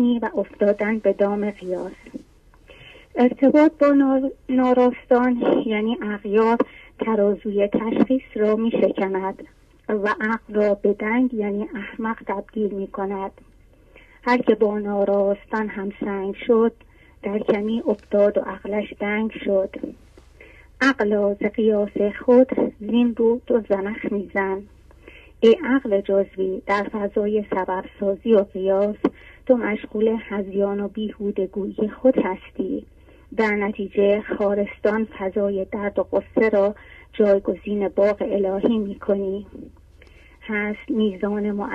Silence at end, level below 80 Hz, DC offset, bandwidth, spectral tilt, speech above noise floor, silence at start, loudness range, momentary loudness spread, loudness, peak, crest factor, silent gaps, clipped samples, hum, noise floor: 0 s; -52 dBFS; under 0.1%; 7.6 kHz; -7.5 dB/octave; 30 dB; 0 s; 4 LU; 10 LU; -22 LUFS; -4 dBFS; 18 dB; none; under 0.1%; none; -51 dBFS